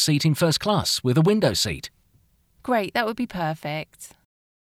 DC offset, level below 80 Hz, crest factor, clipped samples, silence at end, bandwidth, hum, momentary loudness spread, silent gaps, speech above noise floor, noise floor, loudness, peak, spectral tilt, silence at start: under 0.1%; -52 dBFS; 18 dB; under 0.1%; 0.65 s; 16.5 kHz; none; 19 LU; none; 39 dB; -62 dBFS; -22 LUFS; -6 dBFS; -4.5 dB/octave; 0 s